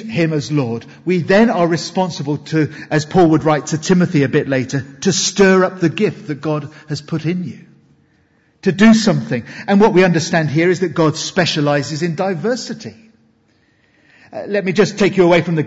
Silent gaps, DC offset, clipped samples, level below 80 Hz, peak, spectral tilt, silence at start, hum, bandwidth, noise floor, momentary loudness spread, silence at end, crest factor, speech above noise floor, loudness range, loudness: none; under 0.1%; under 0.1%; -52 dBFS; -2 dBFS; -5.5 dB/octave; 0 s; none; 8 kHz; -57 dBFS; 12 LU; 0 s; 14 dB; 42 dB; 6 LU; -15 LUFS